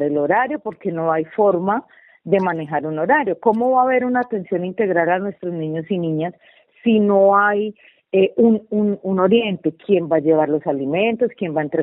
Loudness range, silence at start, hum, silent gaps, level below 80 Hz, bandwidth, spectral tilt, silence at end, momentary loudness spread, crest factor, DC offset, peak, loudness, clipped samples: 3 LU; 0 s; none; none; -64 dBFS; 4 kHz; -10 dB/octave; 0 s; 9 LU; 16 dB; under 0.1%; -2 dBFS; -19 LUFS; under 0.1%